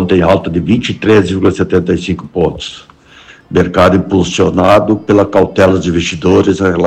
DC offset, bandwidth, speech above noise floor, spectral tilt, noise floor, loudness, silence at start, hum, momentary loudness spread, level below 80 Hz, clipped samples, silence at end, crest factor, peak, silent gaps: under 0.1%; 11.5 kHz; 29 dB; -6.5 dB/octave; -39 dBFS; -11 LUFS; 0 s; none; 7 LU; -36 dBFS; under 0.1%; 0 s; 10 dB; 0 dBFS; none